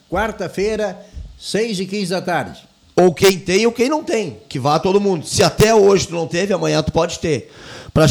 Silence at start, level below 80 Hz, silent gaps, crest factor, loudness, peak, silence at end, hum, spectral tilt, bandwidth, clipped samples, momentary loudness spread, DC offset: 0.1 s; -40 dBFS; none; 14 dB; -17 LUFS; -4 dBFS; 0 s; none; -5 dB/octave; over 20 kHz; under 0.1%; 12 LU; under 0.1%